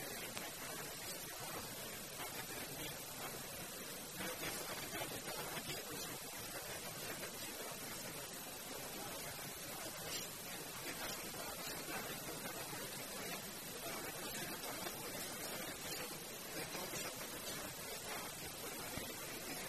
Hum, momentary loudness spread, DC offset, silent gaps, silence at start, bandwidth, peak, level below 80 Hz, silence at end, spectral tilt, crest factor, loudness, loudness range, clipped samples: none; 3 LU; under 0.1%; none; 0 s; 13.5 kHz; -20 dBFS; -70 dBFS; 0 s; -2 dB/octave; 26 dB; -45 LUFS; 1 LU; under 0.1%